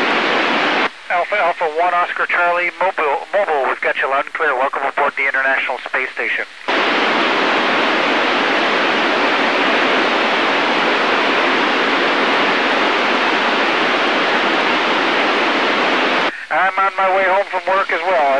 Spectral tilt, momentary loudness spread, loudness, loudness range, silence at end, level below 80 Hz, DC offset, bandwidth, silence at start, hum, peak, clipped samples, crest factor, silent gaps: -3 dB/octave; 4 LU; -15 LUFS; 3 LU; 0 s; -68 dBFS; 0.5%; 10.5 kHz; 0 s; none; -4 dBFS; under 0.1%; 12 dB; none